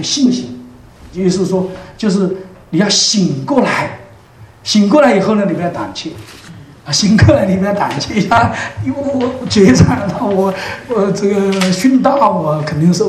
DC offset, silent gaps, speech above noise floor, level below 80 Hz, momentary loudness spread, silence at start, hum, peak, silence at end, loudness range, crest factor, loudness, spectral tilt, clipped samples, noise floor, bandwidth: under 0.1%; none; 27 dB; -38 dBFS; 15 LU; 0 s; none; 0 dBFS; 0 s; 3 LU; 14 dB; -13 LUFS; -5 dB/octave; 0.2%; -39 dBFS; 13 kHz